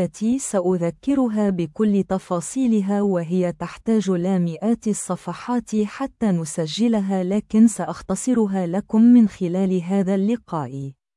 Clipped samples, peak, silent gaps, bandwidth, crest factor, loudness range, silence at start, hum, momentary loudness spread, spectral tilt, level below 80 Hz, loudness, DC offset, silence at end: under 0.1%; -6 dBFS; none; 12 kHz; 14 dB; 4 LU; 0 s; none; 9 LU; -6.5 dB/octave; -54 dBFS; -21 LUFS; under 0.1%; 0.25 s